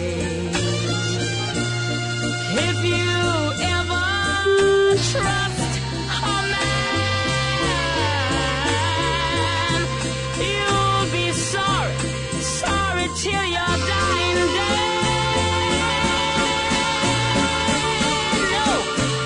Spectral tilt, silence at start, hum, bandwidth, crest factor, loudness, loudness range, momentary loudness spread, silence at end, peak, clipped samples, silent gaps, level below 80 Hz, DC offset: -4 dB/octave; 0 s; none; 11 kHz; 14 dB; -20 LUFS; 2 LU; 5 LU; 0 s; -8 dBFS; under 0.1%; none; -38 dBFS; under 0.1%